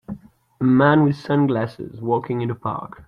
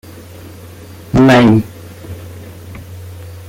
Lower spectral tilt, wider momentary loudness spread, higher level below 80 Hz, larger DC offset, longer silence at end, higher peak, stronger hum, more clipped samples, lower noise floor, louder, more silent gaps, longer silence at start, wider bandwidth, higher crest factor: first, -9.5 dB/octave vs -7 dB/octave; second, 15 LU vs 26 LU; second, -56 dBFS vs -38 dBFS; neither; about the same, 0.05 s vs 0.05 s; second, -4 dBFS vs 0 dBFS; neither; neither; first, -38 dBFS vs -34 dBFS; second, -20 LUFS vs -10 LUFS; neither; second, 0.1 s vs 0.45 s; second, 6.4 kHz vs 16.5 kHz; about the same, 16 dB vs 16 dB